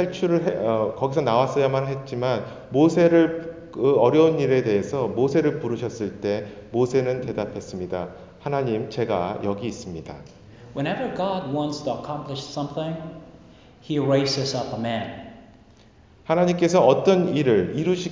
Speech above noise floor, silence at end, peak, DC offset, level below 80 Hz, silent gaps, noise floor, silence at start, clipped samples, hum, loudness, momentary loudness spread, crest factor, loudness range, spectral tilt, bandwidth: 30 dB; 0 s; -4 dBFS; under 0.1%; -54 dBFS; none; -52 dBFS; 0 s; under 0.1%; none; -23 LUFS; 14 LU; 18 dB; 8 LU; -6.5 dB/octave; 7.6 kHz